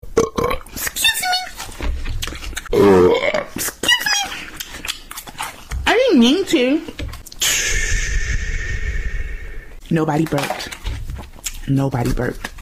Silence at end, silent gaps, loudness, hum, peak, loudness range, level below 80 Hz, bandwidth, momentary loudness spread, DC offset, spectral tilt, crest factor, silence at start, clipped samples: 0 s; none; -18 LUFS; none; -4 dBFS; 5 LU; -28 dBFS; 16 kHz; 16 LU; under 0.1%; -3.5 dB/octave; 16 dB; 0.05 s; under 0.1%